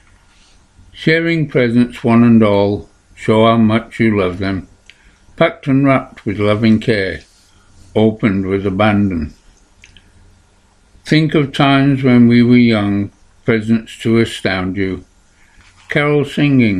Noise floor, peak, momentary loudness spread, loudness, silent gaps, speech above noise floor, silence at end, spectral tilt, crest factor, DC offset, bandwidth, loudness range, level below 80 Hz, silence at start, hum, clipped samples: -51 dBFS; 0 dBFS; 12 LU; -14 LUFS; none; 38 dB; 0 s; -7.5 dB/octave; 14 dB; under 0.1%; 10.5 kHz; 5 LU; -44 dBFS; 0.95 s; none; under 0.1%